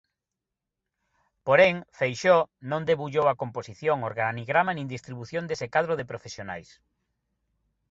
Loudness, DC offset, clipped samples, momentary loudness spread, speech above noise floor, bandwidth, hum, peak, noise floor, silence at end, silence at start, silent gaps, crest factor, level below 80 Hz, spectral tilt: -26 LUFS; under 0.1%; under 0.1%; 16 LU; 61 dB; 7.8 kHz; none; -6 dBFS; -87 dBFS; 1.3 s; 1.45 s; none; 22 dB; -64 dBFS; -5.5 dB/octave